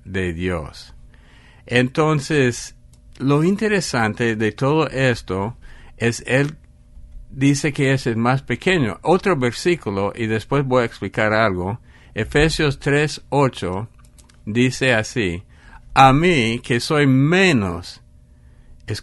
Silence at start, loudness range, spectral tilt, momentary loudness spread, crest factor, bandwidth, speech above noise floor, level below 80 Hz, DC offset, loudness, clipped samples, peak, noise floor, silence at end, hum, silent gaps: 0.05 s; 4 LU; -5.5 dB/octave; 12 LU; 20 dB; 11.5 kHz; 29 dB; -40 dBFS; under 0.1%; -19 LUFS; under 0.1%; 0 dBFS; -47 dBFS; 0 s; none; none